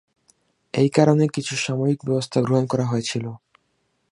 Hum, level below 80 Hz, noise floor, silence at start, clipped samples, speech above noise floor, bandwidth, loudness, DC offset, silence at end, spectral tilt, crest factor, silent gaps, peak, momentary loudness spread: none; -64 dBFS; -70 dBFS; 0.75 s; under 0.1%; 49 dB; 11.5 kHz; -21 LUFS; under 0.1%; 0.75 s; -6 dB/octave; 20 dB; none; -2 dBFS; 11 LU